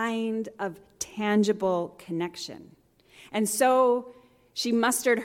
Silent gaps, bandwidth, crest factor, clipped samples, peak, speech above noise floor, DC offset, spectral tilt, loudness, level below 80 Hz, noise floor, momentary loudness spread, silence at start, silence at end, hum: none; 17 kHz; 16 dB; under 0.1%; -10 dBFS; 29 dB; under 0.1%; -4 dB/octave; -27 LUFS; -68 dBFS; -55 dBFS; 15 LU; 0 s; 0 s; none